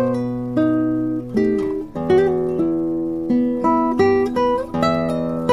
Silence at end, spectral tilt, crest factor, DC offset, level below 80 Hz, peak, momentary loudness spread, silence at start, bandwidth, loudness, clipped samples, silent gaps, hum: 0 s; -8 dB/octave; 14 dB; under 0.1%; -46 dBFS; -4 dBFS; 6 LU; 0 s; 11.5 kHz; -19 LUFS; under 0.1%; none; none